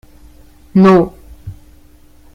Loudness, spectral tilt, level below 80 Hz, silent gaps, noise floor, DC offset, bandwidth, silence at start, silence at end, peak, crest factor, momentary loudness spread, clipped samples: -11 LUFS; -9 dB/octave; -42 dBFS; none; -43 dBFS; under 0.1%; 6.8 kHz; 0.75 s; 0.8 s; 0 dBFS; 16 dB; 26 LU; under 0.1%